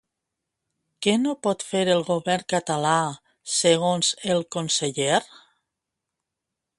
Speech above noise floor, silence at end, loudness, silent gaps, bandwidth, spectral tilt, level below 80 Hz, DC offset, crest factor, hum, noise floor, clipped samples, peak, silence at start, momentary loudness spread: 61 dB; 1.55 s; -23 LUFS; none; 11.5 kHz; -3.5 dB/octave; -68 dBFS; under 0.1%; 20 dB; none; -84 dBFS; under 0.1%; -4 dBFS; 1 s; 6 LU